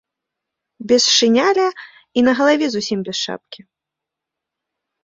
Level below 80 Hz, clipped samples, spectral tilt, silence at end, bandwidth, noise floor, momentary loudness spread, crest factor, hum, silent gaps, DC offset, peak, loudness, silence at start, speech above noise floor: -62 dBFS; under 0.1%; -2.5 dB/octave; 1.45 s; 8 kHz; -84 dBFS; 12 LU; 18 dB; none; none; under 0.1%; -2 dBFS; -16 LUFS; 0.8 s; 67 dB